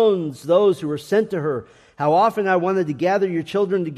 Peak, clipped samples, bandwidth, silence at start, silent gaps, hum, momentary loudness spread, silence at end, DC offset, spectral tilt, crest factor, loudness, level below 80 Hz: -4 dBFS; under 0.1%; 14 kHz; 0 s; none; none; 7 LU; 0 s; under 0.1%; -7 dB/octave; 14 dB; -20 LUFS; -64 dBFS